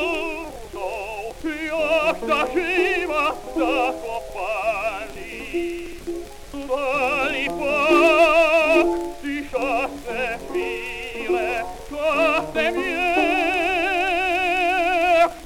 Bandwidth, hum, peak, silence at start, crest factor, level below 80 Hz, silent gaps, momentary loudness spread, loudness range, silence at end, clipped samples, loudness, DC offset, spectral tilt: 16.5 kHz; none; -6 dBFS; 0 s; 16 dB; -44 dBFS; none; 14 LU; 7 LU; 0 s; under 0.1%; -21 LUFS; under 0.1%; -3.5 dB/octave